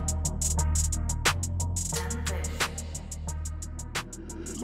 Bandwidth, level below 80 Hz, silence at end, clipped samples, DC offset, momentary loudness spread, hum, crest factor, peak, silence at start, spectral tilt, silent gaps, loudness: 16 kHz; -34 dBFS; 0 s; under 0.1%; under 0.1%; 11 LU; none; 20 dB; -10 dBFS; 0 s; -3 dB/octave; none; -30 LUFS